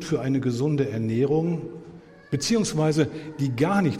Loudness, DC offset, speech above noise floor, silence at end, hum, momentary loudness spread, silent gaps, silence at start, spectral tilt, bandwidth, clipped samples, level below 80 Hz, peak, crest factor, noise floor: -25 LUFS; under 0.1%; 22 dB; 0 s; none; 9 LU; none; 0 s; -6 dB/octave; 14.5 kHz; under 0.1%; -54 dBFS; -8 dBFS; 16 dB; -46 dBFS